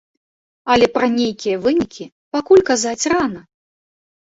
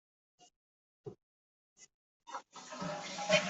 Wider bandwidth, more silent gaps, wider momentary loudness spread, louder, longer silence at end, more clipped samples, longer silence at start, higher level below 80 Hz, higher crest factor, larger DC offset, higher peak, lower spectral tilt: about the same, 8 kHz vs 8.2 kHz; second, 2.12-2.31 s vs 0.56-1.04 s, 1.23-1.76 s, 1.94-2.20 s; second, 14 LU vs 21 LU; first, -17 LUFS vs -40 LUFS; first, 0.85 s vs 0 s; neither; first, 0.65 s vs 0.4 s; first, -50 dBFS vs -80 dBFS; second, 16 dB vs 28 dB; neither; first, -2 dBFS vs -14 dBFS; about the same, -3.5 dB/octave vs -3 dB/octave